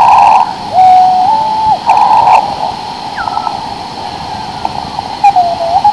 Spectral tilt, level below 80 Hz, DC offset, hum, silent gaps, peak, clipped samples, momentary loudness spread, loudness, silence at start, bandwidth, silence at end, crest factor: -4 dB/octave; -40 dBFS; 0.3%; none; none; 0 dBFS; 2%; 15 LU; -9 LUFS; 0 s; 11 kHz; 0 s; 10 dB